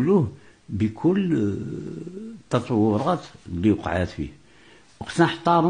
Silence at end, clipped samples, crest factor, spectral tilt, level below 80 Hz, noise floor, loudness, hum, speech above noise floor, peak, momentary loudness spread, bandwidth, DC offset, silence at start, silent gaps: 0 s; under 0.1%; 18 dB; -7.5 dB/octave; -50 dBFS; -53 dBFS; -24 LUFS; none; 30 dB; -6 dBFS; 14 LU; 10 kHz; 0.1%; 0 s; none